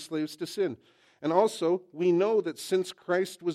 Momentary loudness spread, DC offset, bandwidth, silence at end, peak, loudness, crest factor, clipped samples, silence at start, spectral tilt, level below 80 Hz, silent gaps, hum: 9 LU; under 0.1%; 14.5 kHz; 0 s; -10 dBFS; -28 LUFS; 18 dB; under 0.1%; 0 s; -5.5 dB/octave; -82 dBFS; none; none